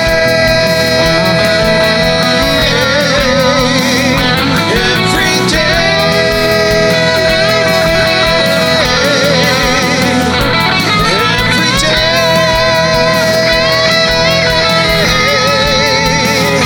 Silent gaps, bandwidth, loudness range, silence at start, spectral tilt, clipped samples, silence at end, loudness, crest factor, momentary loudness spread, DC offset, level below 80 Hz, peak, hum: none; over 20 kHz; 1 LU; 0 s; -3.5 dB/octave; under 0.1%; 0 s; -9 LUFS; 10 dB; 1 LU; under 0.1%; -26 dBFS; 0 dBFS; none